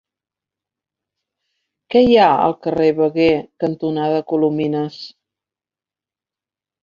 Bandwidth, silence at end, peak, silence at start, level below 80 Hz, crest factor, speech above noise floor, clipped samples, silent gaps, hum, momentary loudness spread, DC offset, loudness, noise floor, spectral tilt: 7 kHz; 1.75 s; -2 dBFS; 1.9 s; -54 dBFS; 18 dB; over 74 dB; under 0.1%; none; none; 12 LU; under 0.1%; -16 LUFS; under -90 dBFS; -7.5 dB/octave